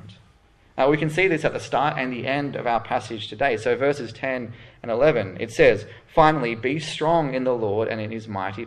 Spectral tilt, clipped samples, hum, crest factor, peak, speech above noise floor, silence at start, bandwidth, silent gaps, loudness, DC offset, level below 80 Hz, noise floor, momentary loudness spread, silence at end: -6 dB/octave; under 0.1%; none; 20 dB; -2 dBFS; 33 dB; 0.05 s; 12 kHz; none; -23 LUFS; under 0.1%; -50 dBFS; -56 dBFS; 11 LU; 0 s